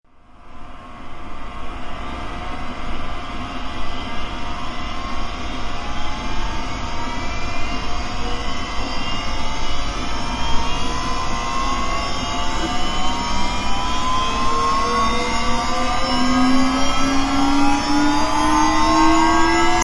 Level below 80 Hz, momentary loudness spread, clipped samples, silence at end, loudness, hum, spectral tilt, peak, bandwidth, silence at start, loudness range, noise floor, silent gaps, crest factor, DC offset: -28 dBFS; 13 LU; under 0.1%; 0 s; -21 LUFS; none; -4 dB/octave; -2 dBFS; 11.5 kHz; 0.3 s; 11 LU; -40 dBFS; none; 16 dB; under 0.1%